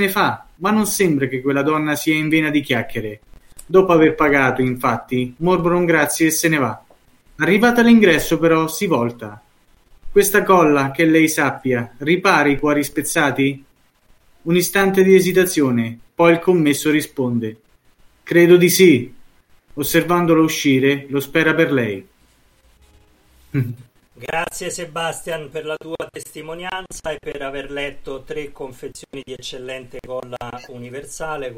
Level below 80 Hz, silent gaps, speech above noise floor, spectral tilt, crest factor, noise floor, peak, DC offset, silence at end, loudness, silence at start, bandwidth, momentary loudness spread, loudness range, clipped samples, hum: -46 dBFS; none; 38 dB; -5 dB/octave; 18 dB; -55 dBFS; 0 dBFS; under 0.1%; 0 s; -17 LUFS; 0 s; 17 kHz; 18 LU; 13 LU; under 0.1%; none